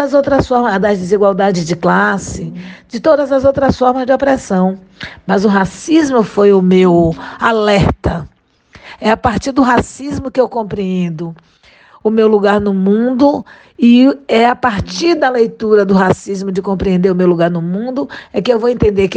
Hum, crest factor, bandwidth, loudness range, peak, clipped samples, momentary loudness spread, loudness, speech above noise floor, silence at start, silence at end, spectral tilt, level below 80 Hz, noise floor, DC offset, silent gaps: none; 12 dB; 9.4 kHz; 4 LU; 0 dBFS; under 0.1%; 10 LU; -12 LUFS; 32 dB; 0 s; 0 s; -6.5 dB/octave; -36 dBFS; -44 dBFS; under 0.1%; none